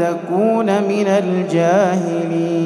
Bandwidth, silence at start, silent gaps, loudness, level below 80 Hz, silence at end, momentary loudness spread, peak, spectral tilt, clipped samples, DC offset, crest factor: 12 kHz; 0 s; none; -16 LUFS; -70 dBFS; 0 s; 5 LU; -4 dBFS; -7 dB/octave; under 0.1%; under 0.1%; 12 dB